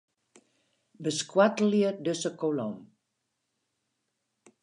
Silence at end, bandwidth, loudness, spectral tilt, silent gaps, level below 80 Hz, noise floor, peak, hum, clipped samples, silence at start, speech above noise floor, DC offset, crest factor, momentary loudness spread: 1.8 s; 11 kHz; -28 LUFS; -5 dB/octave; none; -82 dBFS; -81 dBFS; -10 dBFS; none; under 0.1%; 1 s; 54 dB; under 0.1%; 22 dB; 12 LU